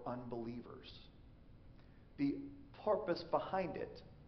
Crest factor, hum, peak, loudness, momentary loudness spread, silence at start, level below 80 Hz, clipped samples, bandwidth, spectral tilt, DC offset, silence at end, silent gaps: 22 dB; none; -22 dBFS; -41 LUFS; 24 LU; 0 s; -64 dBFS; under 0.1%; 6.2 kHz; -5.5 dB/octave; under 0.1%; 0 s; none